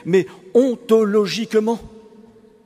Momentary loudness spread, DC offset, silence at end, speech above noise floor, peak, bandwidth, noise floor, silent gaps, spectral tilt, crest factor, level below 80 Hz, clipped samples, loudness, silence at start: 5 LU; under 0.1%; 0.8 s; 30 dB; -4 dBFS; 15 kHz; -47 dBFS; none; -6 dB/octave; 16 dB; -56 dBFS; under 0.1%; -18 LUFS; 0.05 s